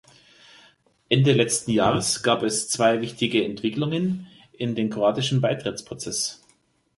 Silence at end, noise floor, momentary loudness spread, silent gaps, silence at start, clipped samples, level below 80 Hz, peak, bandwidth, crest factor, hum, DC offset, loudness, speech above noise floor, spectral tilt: 0.6 s; -64 dBFS; 9 LU; none; 1.1 s; under 0.1%; -58 dBFS; -4 dBFS; 12 kHz; 20 dB; none; under 0.1%; -23 LUFS; 41 dB; -4.5 dB/octave